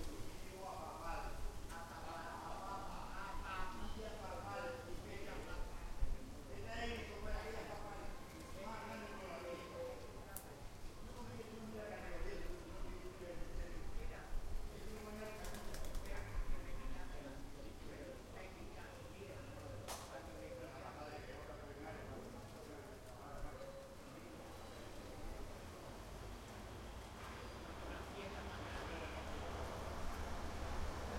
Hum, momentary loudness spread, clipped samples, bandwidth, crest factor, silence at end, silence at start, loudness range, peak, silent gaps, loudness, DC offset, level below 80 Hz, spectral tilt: none; 7 LU; under 0.1%; 16 kHz; 22 dB; 0 s; 0 s; 5 LU; -26 dBFS; none; -51 LUFS; under 0.1%; -52 dBFS; -5 dB/octave